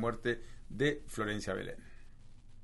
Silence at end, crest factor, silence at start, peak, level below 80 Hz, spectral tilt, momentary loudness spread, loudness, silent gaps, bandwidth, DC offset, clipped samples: 0 s; 20 dB; 0 s; -18 dBFS; -50 dBFS; -5.5 dB/octave; 14 LU; -37 LUFS; none; 11.5 kHz; under 0.1%; under 0.1%